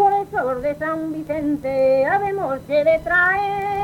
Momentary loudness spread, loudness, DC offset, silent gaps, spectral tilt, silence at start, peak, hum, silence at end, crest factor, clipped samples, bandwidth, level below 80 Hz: 8 LU; -20 LUFS; under 0.1%; none; -6.5 dB/octave; 0 s; -6 dBFS; none; 0 s; 14 dB; under 0.1%; 16.5 kHz; -48 dBFS